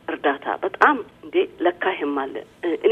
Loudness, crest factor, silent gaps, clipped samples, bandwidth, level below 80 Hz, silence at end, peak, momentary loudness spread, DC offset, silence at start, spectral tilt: -22 LUFS; 22 dB; none; under 0.1%; 8.2 kHz; -64 dBFS; 0 s; 0 dBFS; 9 LU; under 0.1%; 0.1 s; -5 dB/octave